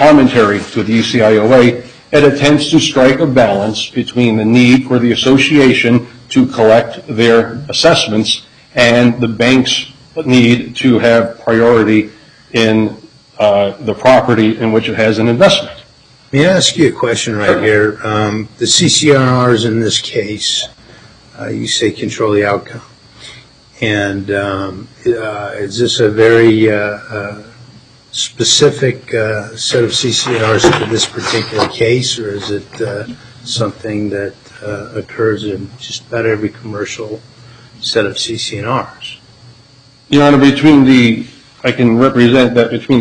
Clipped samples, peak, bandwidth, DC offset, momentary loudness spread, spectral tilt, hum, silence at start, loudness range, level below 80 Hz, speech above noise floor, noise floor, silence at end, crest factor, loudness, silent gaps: under 0.1%; 0 dBFS; 10.5 kHz; under 0.1%; 14 LU; -4.5 dB/octave; none; 0 s; 9 LU; -46 dBFS; 33 dB; -44 dBFS; 0 s; 12 dB; -11 LUFS; none